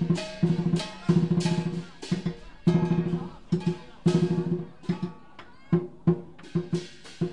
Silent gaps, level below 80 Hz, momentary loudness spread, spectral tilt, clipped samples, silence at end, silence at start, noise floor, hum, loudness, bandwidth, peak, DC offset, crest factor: none; -56 dBFS; 9 LU; -7.5 dB/octave; under 0.1%; 0 s; 0 s; -51 dBFS; none; -28 LUFS; 10.5 kHz; -10 dBFS; 0.4%; 18 dB